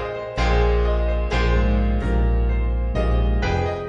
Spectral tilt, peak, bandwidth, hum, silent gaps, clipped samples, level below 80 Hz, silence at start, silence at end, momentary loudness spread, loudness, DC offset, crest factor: -7.5 dB/octave; -8 dBFS; 7 kHz; none; none; under 0.1%; -20 dBFS; 0 s; 0 s; 4 LU; -22 LUFS; under 0.1%; 12 dB